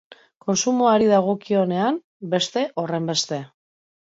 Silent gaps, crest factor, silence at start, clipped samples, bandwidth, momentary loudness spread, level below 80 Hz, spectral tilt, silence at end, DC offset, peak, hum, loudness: 2.04-2.20 s; 16 dB; 0.45 s; under 0.1%; 7.8 kHz; 11 LU; -66 dBFS; -4.5 dB/octave; 0.7 s; under 0.1%; -6 dBFS; none; -21 LUFS